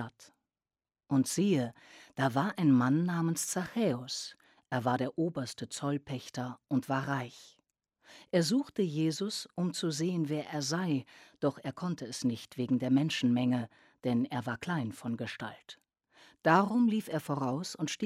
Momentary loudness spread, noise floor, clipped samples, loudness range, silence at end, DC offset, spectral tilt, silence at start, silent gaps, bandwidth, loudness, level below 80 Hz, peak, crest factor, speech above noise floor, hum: 11 LU; under -90 dBFS; under 0.1%; 4 LU; 0 s; under 0.1%; -5.5 dB/octave; 0 s; none; 15.5 kHz; -32 LUFS; -74 dBFS; -10 dBFS; 22 dB; over 58 dB; none